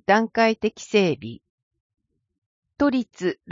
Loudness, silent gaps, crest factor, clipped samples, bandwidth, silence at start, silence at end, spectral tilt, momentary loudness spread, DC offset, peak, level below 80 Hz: -22 LUFS; 1.50-1.71 s, 1.80-1.90 s, 2.38-2.63 s; 20 dB; under 0.1%; 7.6 kHz; 0.1 s; 0.2 s; -5.5 dB/octave; 9 LU; under 0.1%; -4 dBFS; -60 dBFS